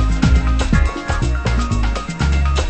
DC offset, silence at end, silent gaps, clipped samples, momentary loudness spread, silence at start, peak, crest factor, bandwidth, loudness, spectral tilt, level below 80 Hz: under 0.1%; 0 s; none; under 0.1%; 5 LU; 0 s; 0 dBFS; 14 dB; 8.6 kHz; -18 LUFS; -6 dB/octave; -18 dBFS